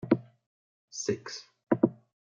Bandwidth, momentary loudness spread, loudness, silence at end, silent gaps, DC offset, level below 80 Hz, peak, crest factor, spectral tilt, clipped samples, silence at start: 7.6 kHz; 15 LU; -31 LUFS; 0.3 s; 0.46-0.88 s; under 0.1%; -72 dBFS; -8 dBFS; 24 dB; -5.5 dB/octave; under 0.1%; 0.05 s